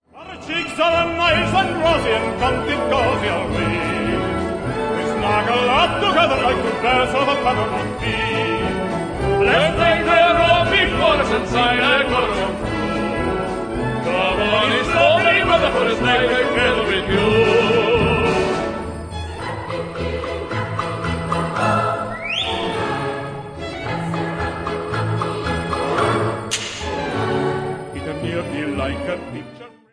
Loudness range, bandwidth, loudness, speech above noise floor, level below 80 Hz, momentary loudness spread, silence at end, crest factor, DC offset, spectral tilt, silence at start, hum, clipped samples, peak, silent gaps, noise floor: 8 LU; 11 kHz; -18 LUFS; 22 dB; -36 dBFS; 11 LU; 0.25 s; 16 dB; under 0.1%; -5 dB/octave; 0.15 s; none; under 0.1%; -2 dBFS; none; -39 dBFS